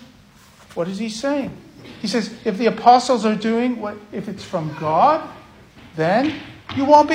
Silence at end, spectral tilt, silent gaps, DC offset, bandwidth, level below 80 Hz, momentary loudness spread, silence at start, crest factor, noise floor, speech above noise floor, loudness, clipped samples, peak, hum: 0 s; -5.5 dB/octave; none; under 0.1%; 15 kHz; -56 dBFS; 17 LU; 0.7 s; 20 dB; -48 dBFS; 30 dB; -19 LUFS; under 0.1%; 0 dBFS; none